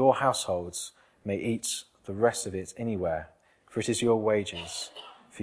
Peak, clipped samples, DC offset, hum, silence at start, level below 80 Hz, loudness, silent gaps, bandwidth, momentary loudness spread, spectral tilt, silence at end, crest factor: -8 dBFS; under 0.1%; under 0.1%; none; 0 s; -60 dBFS; -30 LUFS; none; 11 kHz; 15 LU; -4 dB/octave; 0 s; 22 dB